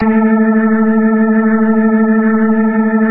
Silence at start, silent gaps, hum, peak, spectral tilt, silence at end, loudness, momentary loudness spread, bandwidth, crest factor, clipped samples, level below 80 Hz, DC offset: 0 s; none; none; -2 dBFS; -14 dB/octave; 0 s; -11 LUFS; 1 LU; 2.8 kHz; 10 dB; under 0.1%; -46 dBFS; under 0.1%